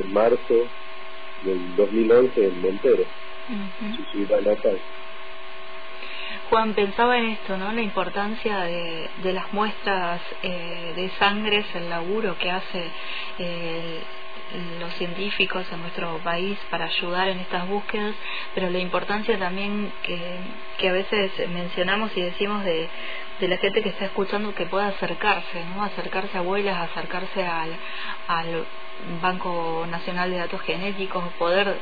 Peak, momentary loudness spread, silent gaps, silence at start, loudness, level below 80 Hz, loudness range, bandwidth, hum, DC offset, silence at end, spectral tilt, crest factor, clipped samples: -8 dBFS; 12 LU; none; 0 s; -25 LUFS; -54 dBFS; 5 LU; 5 kHz; none; 4%; 0 s; -7.5 dB/octave; 18 dB; under 0.1%